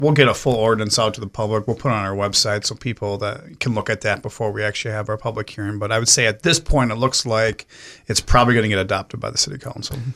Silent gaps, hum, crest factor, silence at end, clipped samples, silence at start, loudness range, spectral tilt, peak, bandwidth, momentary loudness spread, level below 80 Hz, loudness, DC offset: none; none; 20 dB; 0 s; under 0.1%; 0 s; 5 LU; -3.5 dB/octave; 0 dBFS; 15.5 kHz; 12 LU; -34 dBFS; -19 LUFS; under 0.1%